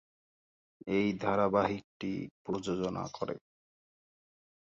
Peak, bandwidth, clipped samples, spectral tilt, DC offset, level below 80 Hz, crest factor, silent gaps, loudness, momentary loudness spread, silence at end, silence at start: -16 dBFS; 7.8 kHz; under 0.1%; -6.5 dB/octave; under 0.1%; -64 dBFS; 20 dB; 1.84-2.00 s, 2.31-2.45 s; -34 LUFS; 11 LU; 1.3 s; 0.85 s